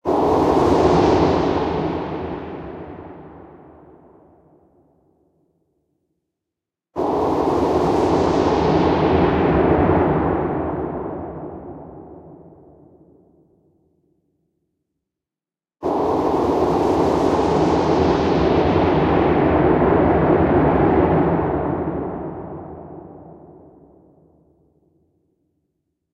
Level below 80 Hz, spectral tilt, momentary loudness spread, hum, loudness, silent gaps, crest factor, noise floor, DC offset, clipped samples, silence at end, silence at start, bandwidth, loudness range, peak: -36 dBFS; -8 dB/octave; 18 LU; none; -18 LUFS; none; 18 dB; under -90 dBFS; under 0.1%; under 0.1%; 2.6 s; 0.05 s; 9.6 kHz; 17 LU; -2 dBFS